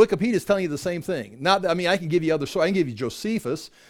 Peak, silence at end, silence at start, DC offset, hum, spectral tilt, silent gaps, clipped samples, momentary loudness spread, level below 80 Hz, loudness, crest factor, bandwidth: -4 dBFS; 0.2 s; 0 s; under 0.1%; none; -5.5 dB/octave; none; under 0.1%; 7 LU; -56 dBFS; -24 LUFS; 18 dB; 17.5 kHz